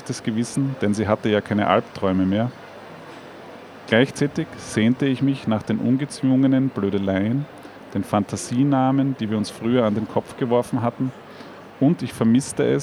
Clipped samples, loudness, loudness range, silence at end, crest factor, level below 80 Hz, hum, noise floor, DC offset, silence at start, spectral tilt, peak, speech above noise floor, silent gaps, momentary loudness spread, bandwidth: under 0.1%; -22 LUFS; 2 LU; 0 s; 20 dB; -60 dBFS; none; -40 dBFS; under 0.1%; 0 s; -6.5 dB/octave; -2 dBFS; 20 dB; none; 20 LU; 13 kHz